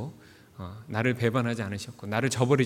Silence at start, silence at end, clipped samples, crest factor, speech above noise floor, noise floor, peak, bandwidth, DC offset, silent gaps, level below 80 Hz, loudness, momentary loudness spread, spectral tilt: 0 s; 0 s; under 0.1%; 20 dB; 24 dB; -51 dBFS; -8 dBFS; 16 kHz; under 0.1%; none; -62 dBFS; -28 LUFS; 16 LU; -6 dB/octave